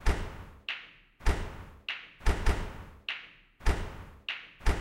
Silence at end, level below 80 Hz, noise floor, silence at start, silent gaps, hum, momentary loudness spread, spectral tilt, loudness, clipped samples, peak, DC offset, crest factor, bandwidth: 0 s; -34 dBFS; -51 dBFS; 0 s; none; none; 11 LU; -4.5 dB/octave; -36 LUFS; under 0.1%; -14 dBFS; under 0.1%; 18 dB; 13 kHz